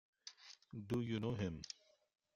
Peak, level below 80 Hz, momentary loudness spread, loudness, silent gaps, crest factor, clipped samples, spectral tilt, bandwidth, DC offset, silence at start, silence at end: -28 dBFS; -70 dBFS; 16 LU; -44 LUFS; none; 18 dB; under 0.1%; -6 dB/octave; 13 kHz; under 0.1%; 0.25 s; 0.65 s